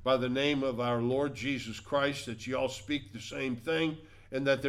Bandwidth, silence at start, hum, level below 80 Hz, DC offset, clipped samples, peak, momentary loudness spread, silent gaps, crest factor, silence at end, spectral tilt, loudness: 14.5 kHz; 0 s; none; -58 dBFS; under 0.1%; under 0.1%; -16 dBFS; 8 LU; none; 16 dB; 0 s; -5 dB/octave; -32 LUFS